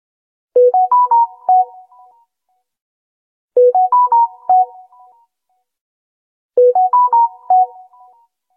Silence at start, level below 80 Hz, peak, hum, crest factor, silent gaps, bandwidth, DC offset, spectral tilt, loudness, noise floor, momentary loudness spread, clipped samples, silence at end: 0.55 s; -74 dBFS; -4 dBFS; none; 12 dB; 2.81-3.48 s, 5.81-6.49 s; 1.9 kHz; under 0.1%; -7.5 dB/octave; -13 LUFS; -68 dBFS; 8 LU; under 0.1%; 0.9 s